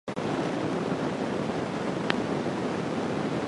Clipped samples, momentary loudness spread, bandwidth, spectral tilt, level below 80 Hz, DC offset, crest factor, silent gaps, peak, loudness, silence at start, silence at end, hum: under 0.1%; 2 LU; 11.5 kHz; -6 dB/octave; -58 dBFS; under 0.1%; 26 dB; none; -4 dBFS; -30 LUFS; 0.05 s; 0 s; none